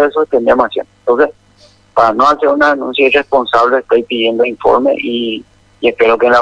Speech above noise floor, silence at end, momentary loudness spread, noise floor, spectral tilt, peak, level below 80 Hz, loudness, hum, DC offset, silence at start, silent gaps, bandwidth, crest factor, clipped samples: 35 dB; 0 s; 7 LU; -46 dBFS; -5 dB/octave; 0 dBFS; -46 dBFS; -12 LUFS; none; under 0.1%; 0 s; none; 8.6 kHz; 12 dB; 0.1%